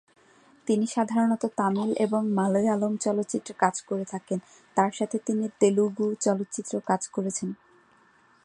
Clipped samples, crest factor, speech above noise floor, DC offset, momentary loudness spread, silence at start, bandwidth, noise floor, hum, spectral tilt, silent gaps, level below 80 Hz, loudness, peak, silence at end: under 0.1%; 22 dB; 34 dB; under 0.1%; 8 LU; 0.65 s; 11 kHz; -60 dBFS; none; -5.5 dB/octave; none; -74 dBFS; -27 LUFS; -6 dBFS; 0.9 s